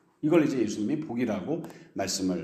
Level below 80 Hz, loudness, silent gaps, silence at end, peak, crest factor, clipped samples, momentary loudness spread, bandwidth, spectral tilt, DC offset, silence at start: -68 dBFS; -28 LUFS; none; 0 s; -10 dBFS; 18 dB; under 0.1%; 11 LU; 14.5 kHz; -5 dB/octave; under 0.1%; 0.25 s